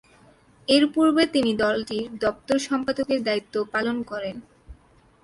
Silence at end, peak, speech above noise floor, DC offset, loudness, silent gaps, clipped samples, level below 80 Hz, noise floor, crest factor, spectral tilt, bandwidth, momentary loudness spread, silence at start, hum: 0.5 s; -4 dBFS; 33 dB; under 0.1%; -23 LUFS; none; under 0.1%; -56 dBFS; -56 dBFS; 20 dB; -4 dB/octave; 11.5 kHz; 12 LU; 0.7 s; none